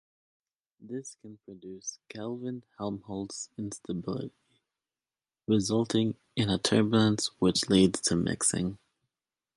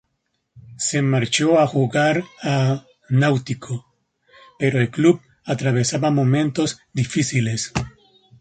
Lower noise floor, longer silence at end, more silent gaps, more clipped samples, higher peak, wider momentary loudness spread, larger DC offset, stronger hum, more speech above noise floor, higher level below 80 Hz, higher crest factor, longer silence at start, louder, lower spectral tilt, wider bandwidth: first, under -90 dBFS vs -73 dBFS; first, 0.8 s vs 0.5 s; neither; neither; second, -8 dBFS vs -4 dBFS; first, 17 LU vs 11 LU; neither; neither; first, over 61 dB vs 54 dB; second, -58 dBFS vs -52 dBFS; first, 22 dB vs 16 dB; first, 0.8 s vs 0.55 s; second, -29 LUFS vs -20 LUFS; about the same, -4.5 dB/octave vs -5.5 dB/octave; first, 11.5 kHz vs 9.4 kHz